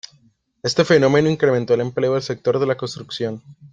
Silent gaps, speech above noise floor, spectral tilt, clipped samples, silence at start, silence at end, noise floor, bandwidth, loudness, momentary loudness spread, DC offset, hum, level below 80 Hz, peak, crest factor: none; 40 dB; -5.5 dB/octave; under 0.1%; 0.65 s; 0.05 s; -58 dBFS; 9.2 kHz; -19 LUFS; 12 LU; under 0.1%; none; -58 dBFS; -2 dBFS; 18 dB